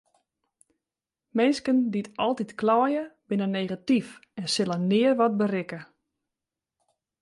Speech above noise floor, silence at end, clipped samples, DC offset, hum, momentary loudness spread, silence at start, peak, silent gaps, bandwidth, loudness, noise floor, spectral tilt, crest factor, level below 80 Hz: 65 dB; 1.4 s; under 0.1%; under 0.1%; none; 10 LU; 1.35 s; -10 dBFS; none; 11.5 kHz; -26 LUFS; -89 dBFS; -5.5 dB/octave; 16 dB; -72 dBFS